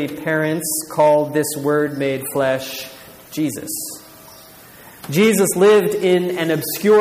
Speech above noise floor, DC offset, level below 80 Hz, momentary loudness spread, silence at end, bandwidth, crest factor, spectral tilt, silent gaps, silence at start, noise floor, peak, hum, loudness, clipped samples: 25 dB; under 0.1%; -60 dBFS; 15 LU; 0 s; 15.5 kHz; 14 dB; -4.5 dB/octave; none; 0 s; -42 dBFS; -4 dBFS; none; -18 LUFS; under 0.1%